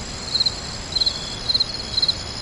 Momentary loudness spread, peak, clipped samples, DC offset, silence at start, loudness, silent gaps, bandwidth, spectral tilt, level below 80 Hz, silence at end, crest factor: 5 LU; -8 dBFS; under 0.1%; under 0.1%; 0 s; -20 LUFS; none; 11.5 kHz; -2 dB/octave; -40 dBFS; 0 s; 16 dB